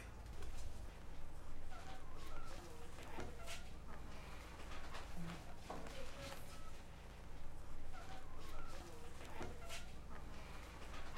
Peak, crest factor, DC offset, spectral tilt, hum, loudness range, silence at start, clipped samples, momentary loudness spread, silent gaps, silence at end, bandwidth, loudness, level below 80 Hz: -32 dBFS; 12 dB; under 0.1%; -4.5 dB/octave; none; 2 LU; 0 s; under 0.1%; 5 LU; none; 0 s; 13 kHz; -54 LUFS; -50 dBFS